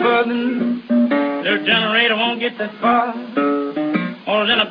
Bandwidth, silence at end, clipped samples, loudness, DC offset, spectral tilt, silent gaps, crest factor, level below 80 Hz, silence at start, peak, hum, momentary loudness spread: 5.2 kHz; 0 s; under 0.1%; -18 LUFS; under 0.1%; -7.5 dB/octave; none; 16 dB; -62 dBFS; 0 s; 0 dBFS; none; 7 LU